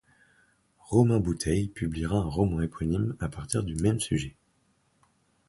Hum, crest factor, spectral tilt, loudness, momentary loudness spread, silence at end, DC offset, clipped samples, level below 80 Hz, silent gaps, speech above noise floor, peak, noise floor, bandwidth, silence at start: none; 20 dB; -6.5 dB/octave; -28 LUFS; 8 LU; 1.2 s; under 0.1%; under 0.1%; -44 dBFS; none; 42 dB; -8 dBFS; -69 dBFS; 11.5 kHz; 0.9 s